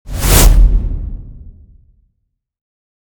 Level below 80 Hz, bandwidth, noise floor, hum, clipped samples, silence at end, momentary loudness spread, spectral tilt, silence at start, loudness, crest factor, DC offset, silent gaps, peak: -14 dBFS; over 20 kHz; -69 dBFS; none; 0.2%; 1.5 s; 20 LU; -4 dB/octave; 0.05 s; -12 LUFS; 14 dB; under 0.1%; none; 0 dBFS